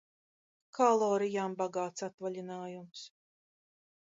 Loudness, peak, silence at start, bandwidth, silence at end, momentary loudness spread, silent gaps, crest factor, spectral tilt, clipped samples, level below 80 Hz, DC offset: -33 LUFS; -14 dBFS; 0.75 s; 7.8 kHz; 1.05 s; 20 LU; 2.14-2.18 s; 20 dB; -5 dB/octave; under 0.1%; -86 dBFS; under 0.1%